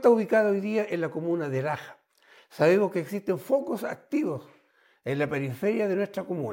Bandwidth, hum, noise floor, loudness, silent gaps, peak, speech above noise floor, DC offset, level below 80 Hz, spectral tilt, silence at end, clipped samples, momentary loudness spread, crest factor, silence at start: 17 kHz; none; -64 dBFS; -27 LUFS; none; -8 dBFS; 38 dB; under 0.1%; -74 dBFS; -7 dB/octave; 0 s; under 0.1%; 11 LU; 18 dB; 0 s